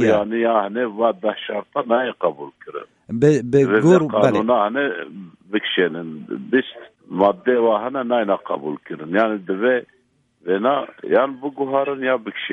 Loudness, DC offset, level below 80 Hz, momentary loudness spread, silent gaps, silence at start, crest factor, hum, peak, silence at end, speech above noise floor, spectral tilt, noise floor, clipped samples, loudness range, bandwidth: -19 LUFS; under 0.1%; -62 dBFS; 15 LU; none; 0 s; 18 dB; none; -2 dBFS; 0 s; 36 dB; -6.5 dB/octave; -55 dBFS; under 0.1%; 4 LU; 9.2 kHz